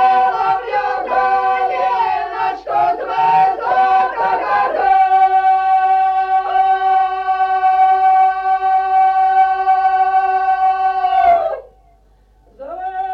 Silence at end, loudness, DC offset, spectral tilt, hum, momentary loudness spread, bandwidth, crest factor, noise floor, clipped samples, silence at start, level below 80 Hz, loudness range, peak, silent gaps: 0 s; -14 LUFS; under 0.1%; -4.5 dB/octave; none; 6 LU; 5.8 kHz; 10 dB; -51 dBFS; under 0.1%; 0 s; -52 dBFS; 3 LU; -4 dBFS; none